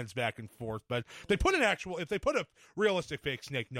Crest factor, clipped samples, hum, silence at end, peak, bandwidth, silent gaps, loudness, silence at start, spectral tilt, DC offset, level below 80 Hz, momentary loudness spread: 18 dB; under 0.1%; none; 0 s; -14 dBFS; 16 kHz; none; -32 LUFS; 0 s; -4.5 dB/octave; under 0.1%; -48 dBFS; 12 LU